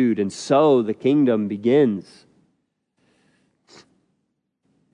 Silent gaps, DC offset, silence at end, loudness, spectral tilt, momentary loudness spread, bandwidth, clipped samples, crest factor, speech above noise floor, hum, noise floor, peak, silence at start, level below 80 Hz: none; under 0.1%; 2.95 s; -19 LUFS; -6.5 dB/octave; 6 LU; 10.5 kHz; under 0.1%; 16 dB; 55 dB; none; -74 dBFS; -6 dBFS; 0 s; -76 dBFS